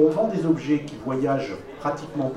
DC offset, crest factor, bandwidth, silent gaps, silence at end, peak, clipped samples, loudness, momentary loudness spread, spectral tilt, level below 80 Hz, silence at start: under 0.1%; 16 dB; 10.5 kHz; none; 0 s; -6 dBFS; under 0.1%; -25 LUFS; 7 LU; -7.5 dB/octave; -54 dBFS; 0 s